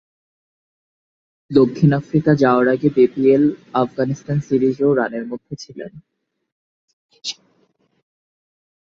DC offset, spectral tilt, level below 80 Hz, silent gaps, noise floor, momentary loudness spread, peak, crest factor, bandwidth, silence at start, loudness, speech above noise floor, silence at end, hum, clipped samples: under 0.1%; -7.5 dB/octave; -56 dBFS; 6.52-7.09 s; -62 dBFS; 17 LU; -2 dBFS; 18 dB; 7.6 kHz; 1.5 s; -17 LUFS; 46 dB; 1.5 s; none; under 0.1%